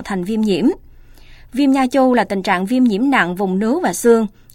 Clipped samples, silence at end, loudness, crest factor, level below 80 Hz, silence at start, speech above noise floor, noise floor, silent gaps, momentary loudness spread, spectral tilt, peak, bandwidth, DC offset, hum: under 0.1%; 0.25 s; -16 LUFS; 14 dB; -46 dBFS; 0 s; 25 dB; -40 dBFS; none; 5 LU; -5.5 dB/octave; -2 dBFS; 16 kHz; under 0.1%; none